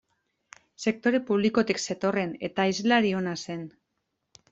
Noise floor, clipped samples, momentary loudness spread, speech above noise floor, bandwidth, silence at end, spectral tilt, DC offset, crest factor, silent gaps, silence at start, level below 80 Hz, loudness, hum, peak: -80 dBFS; under 0.1%; 11 LU; 54 dB; 8 kHz; 0.85 s; -5 dB/octave; under 0.1%; 20 dB; none; 0.8 s; -66 dBFS; -26 LUFS; none; -8 dBFS